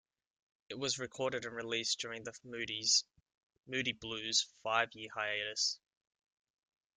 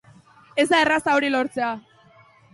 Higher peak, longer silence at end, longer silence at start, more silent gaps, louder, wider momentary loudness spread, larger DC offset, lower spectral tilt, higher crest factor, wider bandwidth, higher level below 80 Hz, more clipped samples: second, -16 dBFS vs -6 dBFS; first, 1.2 s vs 0.75 s; first, 0.7 s vs 0.55 s; first, 3.37-3.50 s vs none; second, -35 LUFS vs -21 LUFS; about the same, 12 LU vs 11 LU; neither; second, -1 dB/octave vs -3 dB/octave; first, 24 dB vs 18 dB; about the same, 12 kHz vs 11.5 kHz; second, -76 dBFS vs -64 dBFS; neither